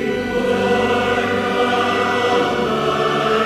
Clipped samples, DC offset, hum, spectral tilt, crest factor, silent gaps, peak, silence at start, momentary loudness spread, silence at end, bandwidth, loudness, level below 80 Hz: under 0.1%; under 0.1%; none; -5 dB/octave; 14 dB; none; -4 dBFS; 0 s; 2 LU; 0 s; 16 kHz; -17 LUFS; -44 dBFS